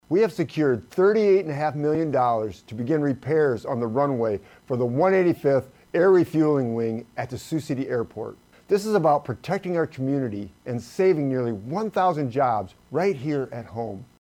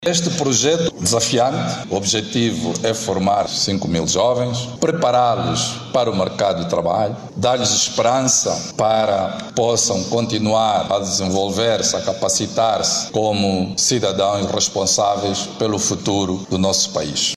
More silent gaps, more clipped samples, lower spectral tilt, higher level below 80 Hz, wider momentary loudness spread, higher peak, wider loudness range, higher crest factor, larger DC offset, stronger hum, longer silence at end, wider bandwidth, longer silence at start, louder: neither; neither; first, -7.5 dB/octave vs -3.5 dB/octave; second, -62 dBFS vs -50 dBFS; first, 13 LU vs 5 LU; second, -10 dBFS vs -4 dBFS; about the same, 3 LU vs 1 LU; about the same, 14 dB vs 14 dB; neither; neither; first, 0.15 s vs 0 s; about the same, 15 kHz vs 15.5 kHz; about the same, 0.1 s vs 0 s; second, -24 LUFS vs -18 LUFS